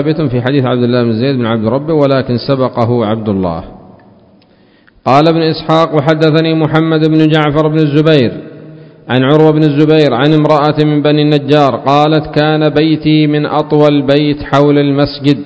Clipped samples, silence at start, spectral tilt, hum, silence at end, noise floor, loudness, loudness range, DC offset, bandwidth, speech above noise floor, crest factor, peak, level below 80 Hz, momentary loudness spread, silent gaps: 1%; 0 s; -8.5 dB/octave; none; 0 s; -46 dBFS; -10 LUFS; 4 LU; under 0.1%; 8 kHz; 37 dB; 10 dB; 0 dBFS; -42 dBFS; 5 LU; none